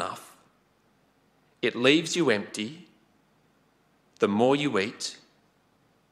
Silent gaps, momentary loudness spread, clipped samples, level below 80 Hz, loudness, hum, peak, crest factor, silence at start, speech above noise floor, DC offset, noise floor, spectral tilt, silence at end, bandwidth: none; 14 LU; under 0.1%; -76 dBFS; -26 LUFS; none; -6 dBFS; 24 dB; 0 s; 41 dB; under 0.1%; -66 dBFS; -4 dB/octave; 0.95 s; 14 kHz